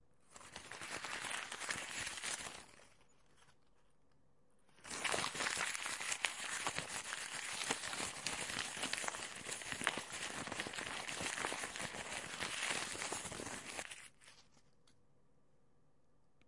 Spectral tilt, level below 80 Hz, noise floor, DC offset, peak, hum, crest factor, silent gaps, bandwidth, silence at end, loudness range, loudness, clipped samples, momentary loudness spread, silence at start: -0.5 dB/octave; -74 dBFS; -77 dBFS; under 0.1%; -14 dBFS; none; 32 dB; none; 11.5 kHz; 2.05 s; 7 LU; -41 LUFS; under 0.1%; 11 LU; 0.3 s